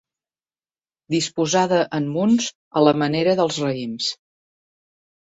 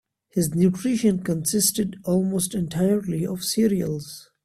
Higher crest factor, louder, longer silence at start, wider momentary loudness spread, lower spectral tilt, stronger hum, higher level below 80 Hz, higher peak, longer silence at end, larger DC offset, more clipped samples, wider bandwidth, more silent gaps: about the same, 20 dB vs 16 dB; first, -20 LUFS vs -23 LUFS; first, 1.1 s vs 0.35 s; about the same, 8 LU vs 7 LU; about the same, -4.5 dB/octave vs -5 dB/octave; neither; second, -64 dBFS vs -56 dBFS; first, -2 dBFS vs -6 dBFS; first, 1.1 s vs 0.2 s; neither; neither; second, 8.2 kHz vs 15.5 kHz; first, 2.55-2.71 s vs none